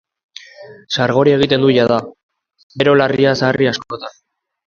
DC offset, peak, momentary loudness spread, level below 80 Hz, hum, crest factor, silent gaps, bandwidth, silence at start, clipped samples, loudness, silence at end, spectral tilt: under 0.1%; 0 dBFS; 16 LU; -52 dBFS; none; 16 dB; 2.23-2.29 s, 2.63-2.70 s; 7.4 kHz; 0.6 s; under 0.1%; -14 LUFS; 0.55 s; -6 dB/octave